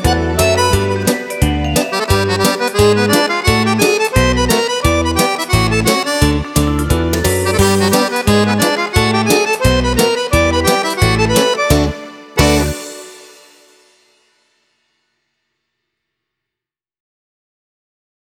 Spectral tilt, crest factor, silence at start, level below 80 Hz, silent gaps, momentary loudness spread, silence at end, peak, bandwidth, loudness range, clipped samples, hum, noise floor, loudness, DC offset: -4.5 dB/octave; 14 dB; 0 s; -26 dBFS; none; 4 LU; 5.1 s; 0 dBFS; 18 kHz; 5 LU; under 0.1%; none; -86 dBFS; -13 LUFS; under 0.1%